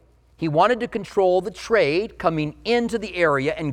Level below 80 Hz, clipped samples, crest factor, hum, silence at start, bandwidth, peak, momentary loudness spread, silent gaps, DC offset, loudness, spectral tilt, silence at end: -50 dBFS; under 0.1%; 16 dB; none; 0.4 s; 12.5 kHz; -4 dBFS; 6 LU; none; under 0.1%; -21 LUFS; -6 dB/octave; 0 s